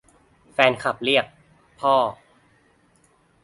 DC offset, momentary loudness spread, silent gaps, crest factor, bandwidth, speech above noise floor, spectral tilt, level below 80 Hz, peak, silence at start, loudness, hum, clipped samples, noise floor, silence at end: under 0.1%; 10 LU; none; 24 dB; 11.5 kHz; 40 dB; -4.5 dB/octave; -64 dBFS; 0 dBFS; 0.6 s; -21 LUFS; none; under 0.1%; -60 dBFS; 1.3 s